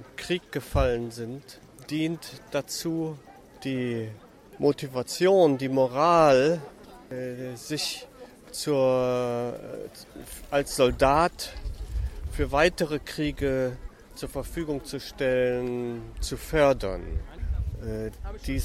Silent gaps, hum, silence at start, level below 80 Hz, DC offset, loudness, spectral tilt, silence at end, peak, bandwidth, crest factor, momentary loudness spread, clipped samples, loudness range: none; none; 0 s; -40 dBFS; under 0.1%; -27 LUFS; -5 dB/octave; 0 s; -8 dBFS; 16 kHz; 20 dB; 17 LU; under 0.1%; 7 LU